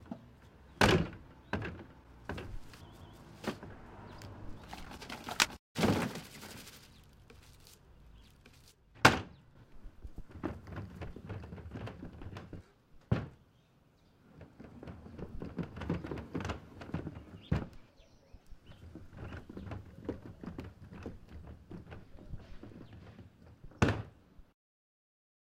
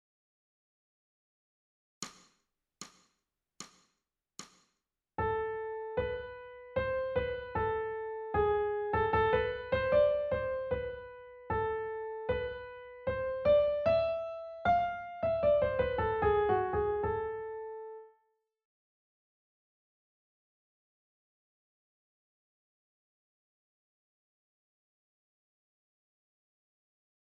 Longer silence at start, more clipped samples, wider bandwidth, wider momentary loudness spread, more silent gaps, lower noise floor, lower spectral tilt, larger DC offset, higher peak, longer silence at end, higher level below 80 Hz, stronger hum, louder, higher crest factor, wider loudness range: second, 0 s vs 2 s; neither; first, 16 kHz vs 9 kHz; first, 25 LU vs 20 LU; first, 5.59-5.75 s vs none; second, -67 dBFS vs -85 dBFS; about the same, -4.5 dB/octave vs -5.5 dB/octave; neither; first, -6 dBFS vs -16 dBFS; second, 1.1 s vs 9.25 s; about the same, -52 dBFS vs -54 dBFS; neither; second, -37 LUFS vs -32 LUFS; first, 34 dB vs 18 dB; second, 13 LU vs 21 LU